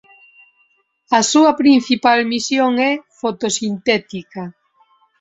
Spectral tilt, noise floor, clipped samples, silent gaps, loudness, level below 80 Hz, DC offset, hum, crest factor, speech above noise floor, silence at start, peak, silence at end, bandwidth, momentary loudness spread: -3 dB/octave; -61 dBFS; under 0.1%; none; -15 LUFS; -60 dBFS; under 0.1%; none; 16 dB; 45 dB; 1.1 s; -2 dBFS; 0.7 s; 8 kHz; 17 LU